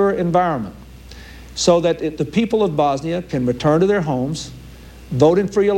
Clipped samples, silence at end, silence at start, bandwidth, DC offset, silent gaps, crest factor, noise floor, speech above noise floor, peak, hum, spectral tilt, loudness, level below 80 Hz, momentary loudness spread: under 0.1%; 0 s; 0 s; 16.5 kHz; under 0.1%; none; 16 dB; -38 dBFS; 21 dB; -2 dBFS; none; -6 dB/octave; -18 LUFS; -42 dBFS; 17 LU